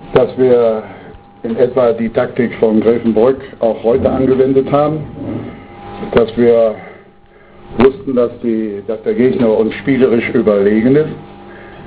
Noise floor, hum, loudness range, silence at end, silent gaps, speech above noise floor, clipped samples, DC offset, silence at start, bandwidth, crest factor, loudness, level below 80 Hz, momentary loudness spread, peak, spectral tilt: -42 dBFS; none; 3 LU; 0 s; none; 30 dB; 0.1%; under 0.1%; 0 s; 4 kHz; 14 dB; -13 LUFS; -40 dBFS; 15 LU; 0 dBFS; -11.5 dB/octave